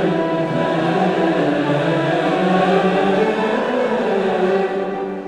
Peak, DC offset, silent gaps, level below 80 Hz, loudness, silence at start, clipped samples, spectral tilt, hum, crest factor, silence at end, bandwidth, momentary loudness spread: -4 dBFS; under 0.1%; none; -54 dBFS; -18 LUFS; 0 s; under 0.1%; -7 dB/octave; none; 14 dB; 0 s; 10 kHz; 4 LU